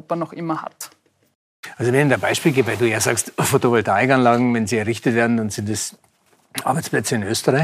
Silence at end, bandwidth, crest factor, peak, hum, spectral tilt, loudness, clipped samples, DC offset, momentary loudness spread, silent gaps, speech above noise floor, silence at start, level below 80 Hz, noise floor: 0 s; 15.5 kHz; 18 dB; -2 dBFS; none; -4.5 dB/octave; -19 LUFS; under 0.1%; under 0.1%; 12 LU; 1.35-1.63 s; 35 dB; 0.1 s; -62 dBFS; -54 dBFS